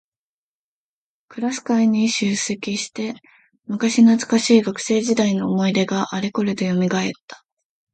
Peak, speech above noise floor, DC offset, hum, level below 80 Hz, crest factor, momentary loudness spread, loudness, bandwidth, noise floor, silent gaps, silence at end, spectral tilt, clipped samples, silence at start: -2 dBFS; over 71 dB; under 0.1%; none; -64 dBFS; 18 dB; 12 LU; -19 LUFS; 9.2 kHz; under -90 dBFS; 7.21-7.28 s; 0.6 s; -5 dB/octave; under 0.1%; 1.3 s